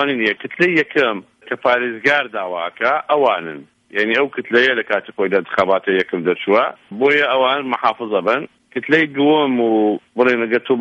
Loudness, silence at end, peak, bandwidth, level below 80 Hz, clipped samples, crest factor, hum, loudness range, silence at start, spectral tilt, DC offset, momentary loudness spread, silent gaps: -17 LUFS; 0 s; -2 dBFS; 8 kHz; -64 dBFS; under 0.1%; 16 dB; none; 2 LU; 0 s; -6 dB/octave; under 0.1%; 9 LU; none